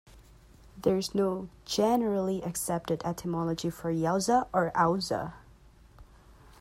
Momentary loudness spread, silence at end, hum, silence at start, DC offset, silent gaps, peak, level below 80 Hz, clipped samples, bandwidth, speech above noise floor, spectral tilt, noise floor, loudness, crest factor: 7 LU; 0.55 s; none; 0.15 s; under 0.1%; none; -12 dBFS; -56 dBFS; under 0.1%; 16 kHz; 27 dB; -5 dB/octave; -56 dBFS; -29 LUFS; 18 dB